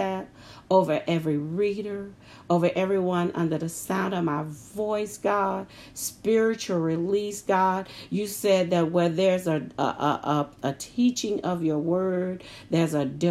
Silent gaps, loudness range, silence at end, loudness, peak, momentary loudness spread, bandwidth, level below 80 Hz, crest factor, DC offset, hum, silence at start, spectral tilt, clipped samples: none; 2 LU; 0 s; -26 LUFS; -6 dBFS; 9 LU; 15.5 kHz; -62 dBFS; 18 dB; under 0.1%; none; 0 s; -5.5 dB/octave; under 0.1%